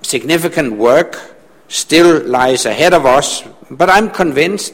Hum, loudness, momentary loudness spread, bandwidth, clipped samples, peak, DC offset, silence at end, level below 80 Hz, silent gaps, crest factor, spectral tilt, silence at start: none; -11 LUFS; 11 LU; 17 kHz; 0.1%; 0 dBFS; under 0.1%; 0.05 s; -44 dBFS; none; 12 dB; -3.5 dB/octave; 0.05 s